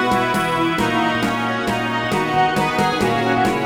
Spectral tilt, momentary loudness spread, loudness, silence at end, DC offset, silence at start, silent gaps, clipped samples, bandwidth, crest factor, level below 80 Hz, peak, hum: -5 dB/octave; 3 LU; -18 LUFS; 0 s; 0.2%; 0 s; none; under 0.1%; over 20 kHz; 14 dB; -44 dBFS; -4 dBFS; none